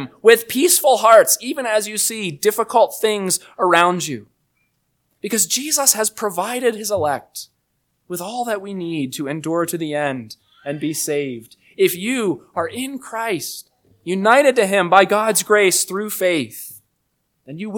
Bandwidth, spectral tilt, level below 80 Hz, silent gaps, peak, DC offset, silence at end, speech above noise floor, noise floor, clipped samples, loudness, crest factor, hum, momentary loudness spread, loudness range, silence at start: 19 kHz; -2.5 dB/octave; -68 dBFS; none; 0 dBFS; under 0.1%; 0 s; 52 dB; -70 dBFS; under 0.1%; -17 LUFS; 18 dB; none; 16 LU; 8 LU; 0 s